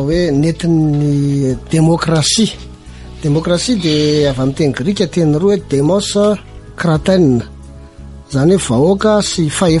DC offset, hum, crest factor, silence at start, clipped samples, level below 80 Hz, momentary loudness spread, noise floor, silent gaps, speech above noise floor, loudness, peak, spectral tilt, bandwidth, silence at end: under 0.1%; none; 12 dB; 0 s; under 0.1%; -34 dBFS; 6 LU; -33 dBFS; none; 21 dB; -13 LUFS; -2 dBFS; -5.5 dB/octave; 11.5 kHz; 0 s